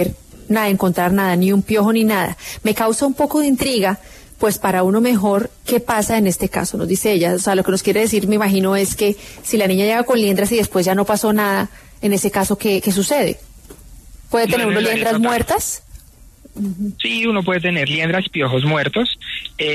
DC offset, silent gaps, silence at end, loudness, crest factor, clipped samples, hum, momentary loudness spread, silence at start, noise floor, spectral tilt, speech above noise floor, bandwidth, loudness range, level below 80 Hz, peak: under 0.1%; none; 0 s; -17 LUFS; 12 dB; under 0.1%; none; 6 LU; 0 s; -44 dBFS; -4.5 dB/octave; 27 dB; 14 kHz; 3 LU; -44 dBFS; -4 dBFS